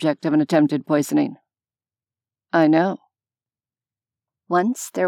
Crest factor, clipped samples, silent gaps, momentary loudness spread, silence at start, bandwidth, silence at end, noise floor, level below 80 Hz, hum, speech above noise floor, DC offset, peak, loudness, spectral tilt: 18 dB; under 0.1%; none; 7 LU; 0 s; 15 kHz; 0 s; under -90 dBFS; -88 dBFS; none; over 71 dB; under 0.1%; -4 dBFS; -20 LUFS; -6 dB/octave